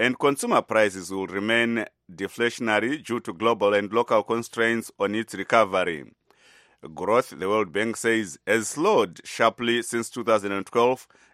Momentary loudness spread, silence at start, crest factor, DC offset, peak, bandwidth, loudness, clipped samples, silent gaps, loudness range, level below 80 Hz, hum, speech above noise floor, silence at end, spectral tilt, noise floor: 8 LU; 0 s; 22 dB; under 0.1%; -2 dBFS; 15.5 kHz; -24 LUFS; under 0.1%; none; 2 LU; -68 dBFS; none; 33 dB; 0.3 s; -4 dB/octave; -57 dBFS